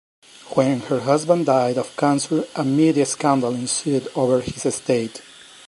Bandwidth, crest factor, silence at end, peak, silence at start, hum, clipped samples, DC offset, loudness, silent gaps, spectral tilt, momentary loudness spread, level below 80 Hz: 11.5 kHz; 18 dB; 0.45 s; -2 dBFS; 0.45 s; none; under 0.1%; under 0.1%; -20 LUFS; none; -5 dB/octave; 6 LU; -58 dBFS